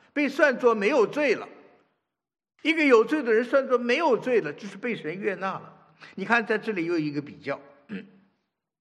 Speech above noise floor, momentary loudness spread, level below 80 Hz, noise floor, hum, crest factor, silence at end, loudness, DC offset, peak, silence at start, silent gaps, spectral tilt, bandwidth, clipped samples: 53 dB; 17 LU; -84 dBFS; -78 dBFS; none; 20 dB; 0.75 s; -24 LUFS; under 0.1%; -4 dBFS; 0.15 s; none; -5.5 dB/octave; 11 kHz; under 0.1%